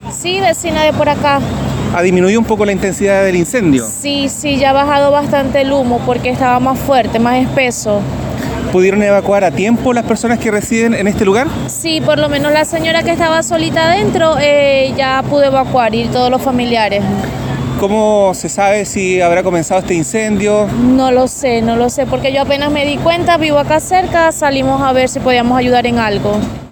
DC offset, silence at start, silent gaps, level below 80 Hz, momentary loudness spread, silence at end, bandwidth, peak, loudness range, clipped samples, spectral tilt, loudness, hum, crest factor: under 0.1%; 0 s; none; -34 dBFS; 5 LU; 0.05 s; 19.5 kHz; 0 dBFS; 2 LU; under 0.1%; -5 dB/octave; -12 LUFS; none; 12 dB